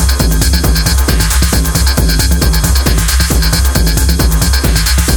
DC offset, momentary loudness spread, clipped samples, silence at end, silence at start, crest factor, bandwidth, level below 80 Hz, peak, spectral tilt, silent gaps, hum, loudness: under 0.1%; 1 LU; under 0.1%; 0 s; 0 s; 10 dB; over 20 kHz; -12 dBFS; 0 dBFS; -4 dB/octave; none; none; -11 LUFS